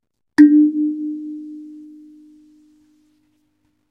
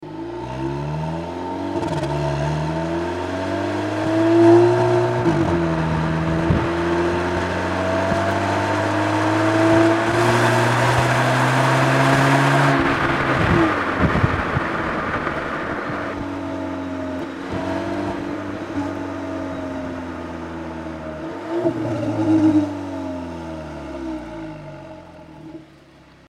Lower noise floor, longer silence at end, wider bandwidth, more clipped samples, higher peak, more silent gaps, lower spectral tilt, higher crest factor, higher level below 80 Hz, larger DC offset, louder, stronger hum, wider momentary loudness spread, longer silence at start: first, -66 dBFS vs -48 dBFS; first, 2.1 s vs 0.65 s; second, 6 kHz vs 14 kHz; neither; about the same, 0 dBFS vs -2 dBFS; neither; about the same, -6 dB/octave vs -6.5 dB/octave; about the same, 20 dB vs 18 dB; second, -68 dBFS vs -42 dBFS; neither; first, -15 LUFS vs -20 LUFS; neither; first, 25 LU vs 15 LU; first, 0.4 s vs 0 s